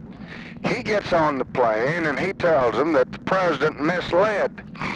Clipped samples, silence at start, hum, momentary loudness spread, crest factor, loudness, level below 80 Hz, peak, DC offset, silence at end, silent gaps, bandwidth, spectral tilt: under 0.1%; 0 s; none; 9 LU; 14 dB; -22 LUFS; -50 dBFS; -8 dBFS; under 0.1%; 0 s; none; 9.6 kHz; -6 dB/octave